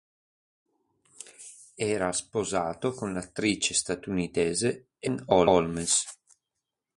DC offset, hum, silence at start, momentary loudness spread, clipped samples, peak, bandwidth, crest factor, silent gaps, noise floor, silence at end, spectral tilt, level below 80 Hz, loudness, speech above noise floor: under 0.1%; none; 1.25 s; 20 LU; under 0.1%; -6 dBFS; 11.5 kHz; 24 dB; none; -86 dBFS; 0.85 s; -3.5 dB/octave; -56 dBFS; -27 LUFS; 58 dB